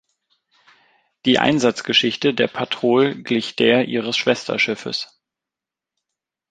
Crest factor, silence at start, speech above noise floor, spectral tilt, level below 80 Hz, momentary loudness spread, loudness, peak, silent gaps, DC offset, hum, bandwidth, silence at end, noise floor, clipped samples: 20 dB; 1.25 s; 69 dB; -4.5 dB/octave; -60 dBFS; 8 LU; -19 LUFS; -2 dBFS; none; under 0.1%; none; 9.4 kHz; 1.45 s; -87 dBFS; under 0.1%